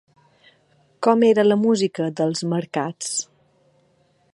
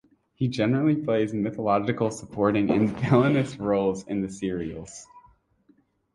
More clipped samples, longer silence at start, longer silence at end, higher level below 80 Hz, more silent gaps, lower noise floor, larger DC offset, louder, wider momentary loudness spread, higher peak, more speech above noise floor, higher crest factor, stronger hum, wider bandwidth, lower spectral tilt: neither; first, 1 s vs 0.4 s; first, 1.1 s vs 0.95 s; second, -72 dBFS vs -56 dBFS; neither; about the same, -62 dBFS vs -63 dBFS; neither; first, -20 LUFS vs -25 LUFS; about the same, 11 LU vs 10 LU; first, -2 dBFS vs -8 dBFS; about the same, 42 dB vs 39 dB; about the same, 20 dB vs 18 dB; neither; about the same, 11.5 kHz vs 11.5 kHz; second, -5 dB/octave vs -7 dB/octave